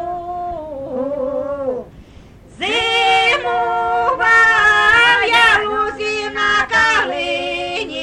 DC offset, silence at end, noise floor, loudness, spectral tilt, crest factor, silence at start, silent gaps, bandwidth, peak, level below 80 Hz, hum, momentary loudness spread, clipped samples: under 0.1%; 0 s; -41 dBFS; -14 LUFS; -2 dB/octave; 16 dB; 0 s; none; 12.5 kHz; -2 dBFS; -44 dBFS; none; 15 LU; under 0.1%